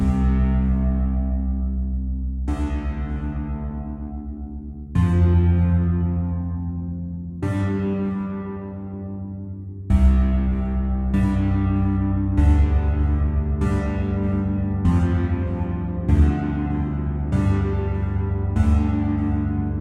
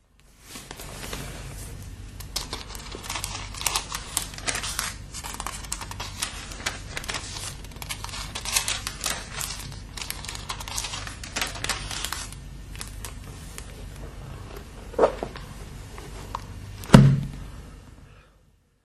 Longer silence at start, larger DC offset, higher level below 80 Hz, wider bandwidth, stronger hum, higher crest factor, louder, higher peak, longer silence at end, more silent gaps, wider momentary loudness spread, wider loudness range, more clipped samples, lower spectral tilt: second, 0 s vs 0.3 s; neither; first, -26 dBFS vs -40 dBFS; second, 4.2 kHz vs 13.5 kHz; neither; second, 14 dB vs 28 dB; first, -22 LUFS vs -28 LUFS; second, -6 dBFS vs 0 dBFS; second, 0 s vs 0.6 s; neither; second, 13 LU vs 17 LU; second, 6 LU vs 9 LU; neither; first, -9.5 dB/octave vs -4 dB/octave